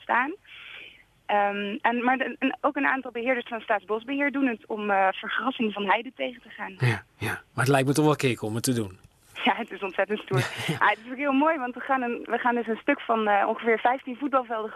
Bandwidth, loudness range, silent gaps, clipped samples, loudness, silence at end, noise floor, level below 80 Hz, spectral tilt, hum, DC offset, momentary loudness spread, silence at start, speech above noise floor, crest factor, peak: 13.5 kHz; 2 LU; none; under 0.1%; -26 LUFS; 0 s; -50 dBFS; -66 dBFS; -5.5 dB/octave; none; under 0.1%; 9 LU; 0 s; 24 dB; 20 dB; -6 dBFS